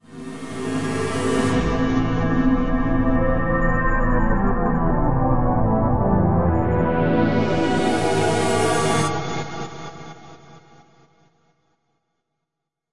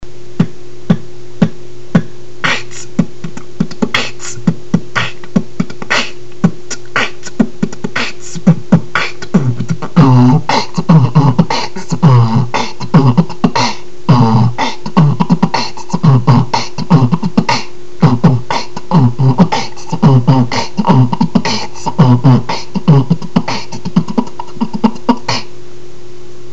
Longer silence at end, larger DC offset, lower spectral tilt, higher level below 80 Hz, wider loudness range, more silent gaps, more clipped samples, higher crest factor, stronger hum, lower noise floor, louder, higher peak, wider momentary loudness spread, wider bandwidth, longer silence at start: about the same, 0 s vs 0 s; second, 3% vs 10%; about the same, -6.5 dB/octave vs -6.5 dB/octave; first, -28 dBFS vs -42 dBFS; about the same, 6 LU vs 6 LU; neither; second, under 0.1% vs 0.4%; about the same, 14 dB vs 14 dB; neither; first, -82 dBFS vs -34 dBFS; second, -21 LUFS vs -13 LUFS; second, -6 dBFS vs 0 dBFS; about the same, 11 LU vs 11 LU; first, 11.5 kHz vs 8.2 kHz; about the same, 0 s vs 0 s